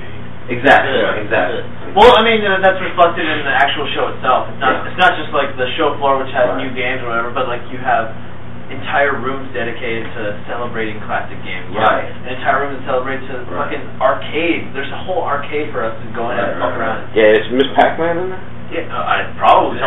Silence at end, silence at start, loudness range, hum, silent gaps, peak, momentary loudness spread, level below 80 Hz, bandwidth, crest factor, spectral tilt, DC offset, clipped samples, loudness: 0 s; 0 s; 7 LU; 60 Hz at -35 dBFS; none; 0 dBFS; 13 LU; -42 dBFS; 10.5 kHz; 16 dB; -6 dB/octave; 8%; under 0.1%; -16 LUFS